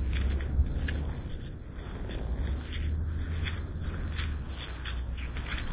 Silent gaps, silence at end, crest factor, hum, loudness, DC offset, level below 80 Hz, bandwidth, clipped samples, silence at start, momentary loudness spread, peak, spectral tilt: none; 0 s; 16 dB; none; -35 LUFS; under 0.1%; -34 dBFS; 4 kHz; under 0.1%; 0 s; 9 LU; -16 dBFS; -10 dB/octave